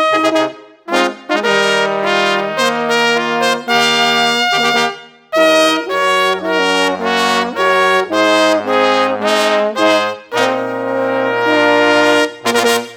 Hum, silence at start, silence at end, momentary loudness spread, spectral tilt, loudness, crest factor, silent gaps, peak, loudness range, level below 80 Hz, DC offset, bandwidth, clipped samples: none; 0 s; 0 s; 6 LU; -2.5 dB/octave; -13 LUFS; 14 dB; none; 0 dBFS; 1 LU; -64 dBFS; under 0.1%; over 20 kHz; under 0.1%